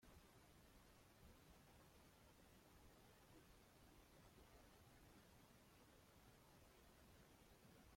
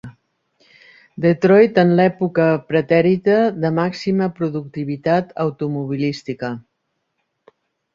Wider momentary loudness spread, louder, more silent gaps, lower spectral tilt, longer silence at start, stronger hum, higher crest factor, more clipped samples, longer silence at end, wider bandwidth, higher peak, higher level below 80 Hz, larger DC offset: second, 1 LU vs 13 LU; second, -70 LUFS vs -18 LUFS; neither; second, -4 dB/octave vs -8 dB/octave; about the same, 0 s vs 0.05 s; neither; about the same, 14 dB vs 16 dB; neither; second, 0 s vs 1.35 s; first, 16.5 kHz vs 7.4 kHz; second, -56 dBFS vs -2 dBFS; second, -76 dBFS vs -58 dBFS; neither